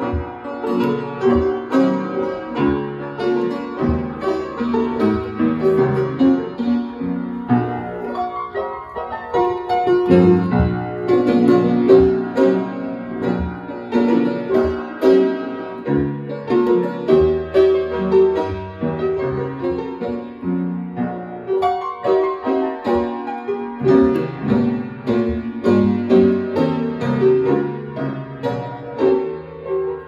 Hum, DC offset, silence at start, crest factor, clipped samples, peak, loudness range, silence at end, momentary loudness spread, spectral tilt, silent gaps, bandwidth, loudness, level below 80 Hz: none; under 0.1%; 0 s; 18 dB; under 0.1%; 0 dBFS; 5 LU; 0 s; 11 LU; -9 dB/octave; none; 7.2 kHz; -19 LUFS; -40 dBFS